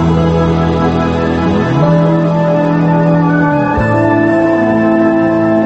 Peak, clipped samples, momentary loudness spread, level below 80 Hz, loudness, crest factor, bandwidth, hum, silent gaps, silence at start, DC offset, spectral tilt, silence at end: 0 dBFS; under 0.1%; 2 LU; -30 dBFS; -11 LUFS; 10 dB; 7.6 kHz; none; none; 0 s; under 0.1%; -8.5 dB/octave; 0 s